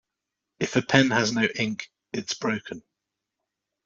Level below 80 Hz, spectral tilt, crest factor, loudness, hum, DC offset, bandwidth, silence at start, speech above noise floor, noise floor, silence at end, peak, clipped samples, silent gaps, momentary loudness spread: -64 dBFS; -4.5 dB/octave; 22 dB; -25 LUFS; none; under 0.1%; 7.8 kHz; 0.6 s; 60 dB; -85 dBFS; 1.05 s; -4 dBFS; under 0.1%; none; 16 LU